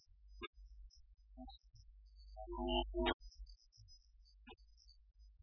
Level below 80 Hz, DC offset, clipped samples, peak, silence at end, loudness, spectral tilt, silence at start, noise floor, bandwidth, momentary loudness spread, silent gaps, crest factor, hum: -54 dBFS; under 0.1%; under 0.1%; -24 dBFS; 0 s; -44 LUFS; -3 dB/octave; 0.15 s; -66 dBFS; 5.4 kHz; 26 LU; 0.47-0.53 s, 3.14-3.20 s; 24 dB; none